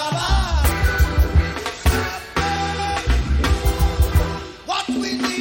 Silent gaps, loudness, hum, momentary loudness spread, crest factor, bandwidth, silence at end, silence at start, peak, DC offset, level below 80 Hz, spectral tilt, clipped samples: none; -20 LUFS; none; 6 LU; 14 dB; 17 kHz; 0 s; 0 s; -6 dBFS; under 0.1%; -22 dBFS; -5 dB/octave; under 0.1%